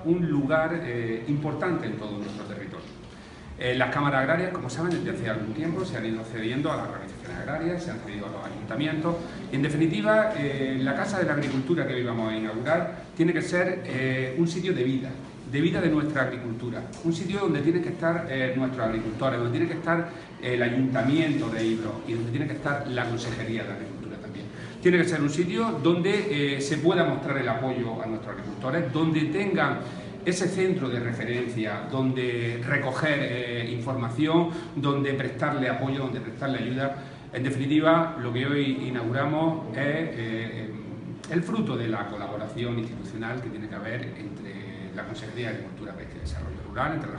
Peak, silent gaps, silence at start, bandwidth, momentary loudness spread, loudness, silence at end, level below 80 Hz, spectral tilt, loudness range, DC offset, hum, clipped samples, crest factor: -8 dBFS; none; 0 s; 11 kHz; 12 LU; -27 LUFS; 0 s; -52 dBFS; -6.5 dB/octave; 5 LU; under 0.1%; none; under 0.1%; 20 dB